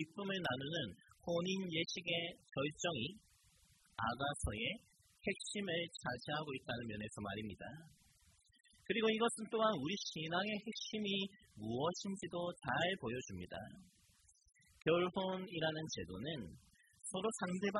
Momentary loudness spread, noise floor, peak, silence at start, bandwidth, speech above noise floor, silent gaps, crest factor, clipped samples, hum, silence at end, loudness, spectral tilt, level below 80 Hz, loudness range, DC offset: 12 LU; -71 dBFS; -22 dBFS; 0 s; 12 kHz; 30 dB; none; 20 dB; under 0.1%; none; 0 s; -41 LUFS; -4 dB/octave; -64 dBFS; 4 LU; under 0.1%